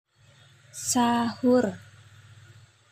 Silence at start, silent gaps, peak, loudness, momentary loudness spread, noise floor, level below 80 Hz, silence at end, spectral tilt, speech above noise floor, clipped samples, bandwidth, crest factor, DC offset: 0.75 s; none; -12 dBFS; -25 LUFS; 17 LU; -57 dBFS; -66 dBFS; 1.15 s; -4 dB/octave; 33 dB; under 0.1%; 15.5 kHz; 16 dB; under 0.1%